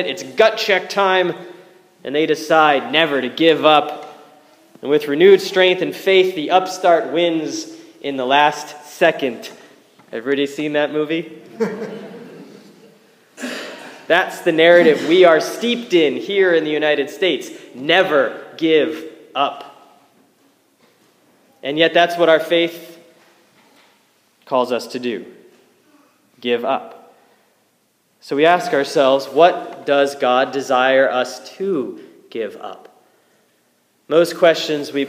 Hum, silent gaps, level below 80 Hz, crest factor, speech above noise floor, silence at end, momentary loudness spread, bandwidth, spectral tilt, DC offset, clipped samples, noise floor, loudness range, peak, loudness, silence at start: none; none; -74 dBFS; 18 dB; 46 dB; 0 s; 17 LU; 15.5 kHz; -4 dB/octave; under 0.1%; under 0.1%; -62 dBFS; 10 LU; 0 dBFS; -16 LUFS; 0 s